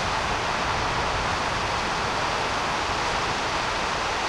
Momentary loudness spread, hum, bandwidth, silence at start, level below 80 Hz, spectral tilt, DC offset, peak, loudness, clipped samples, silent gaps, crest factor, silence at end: 1 LU; none; 15.5 kHz; 0 s; -40 dBFS; -3 dB/octave; under 0.1%; -14 dBFS; -25 LUFS; under 0.1%; none; 12 dB; 0 s